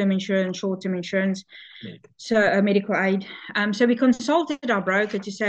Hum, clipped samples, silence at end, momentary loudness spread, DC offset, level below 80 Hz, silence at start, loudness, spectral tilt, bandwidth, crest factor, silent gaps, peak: none; under 0.1%; 0 s; 20 LU; under 0.1%; -66 dBFS; 0 s; -22 LUFS; -6 dB/octave; 8.4 kHz; 16 dB; none; -6 dBFS